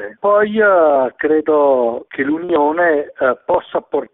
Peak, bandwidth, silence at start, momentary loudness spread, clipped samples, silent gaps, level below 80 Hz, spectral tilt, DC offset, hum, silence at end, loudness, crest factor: -2 dBFS; 4 kHz; 0 s; 8 LU; under 0.1%; none; -56 dBFS; -10.5 dB/octave; under 0.1%; none; 0.1 s; -15 LUFS; 12 dB